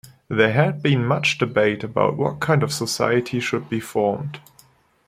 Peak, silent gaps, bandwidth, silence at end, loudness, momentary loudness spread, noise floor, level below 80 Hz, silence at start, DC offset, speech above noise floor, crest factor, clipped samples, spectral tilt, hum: -2 dBFS; none; 16 kHz; 0.7 s; -21 LUFS; 7 LU; -55 dBFS; -58 dBFS; 0.05 s; under 0.1%; 35 dB; 18 dB; under 0.1%; -5.5 dB/octave; none